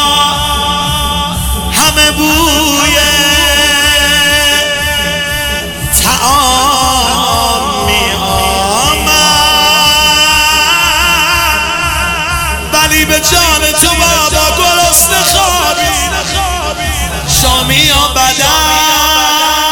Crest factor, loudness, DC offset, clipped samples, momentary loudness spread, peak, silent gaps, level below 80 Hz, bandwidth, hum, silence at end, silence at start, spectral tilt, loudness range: 10 dB; -8 LUFS; 0.4%; 0.2%; 7 LU; 0 dBFS; none; -22 dBFS; over 20 kHz; none; 0 s; 0 s; -1.5 dB/octave; 2 LU